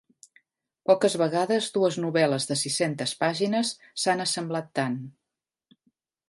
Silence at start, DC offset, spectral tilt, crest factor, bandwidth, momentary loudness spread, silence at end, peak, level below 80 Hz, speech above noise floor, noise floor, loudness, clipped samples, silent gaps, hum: 0.9 s; under 0.1%; -4 dB/octave; 20 dB; 11.5 kHz; 7 LU; 1.2 s; -8 dBFS; -74 dBFS; 62 dB; -87 dBFS; -26 LUFS; under 0.1%; none; none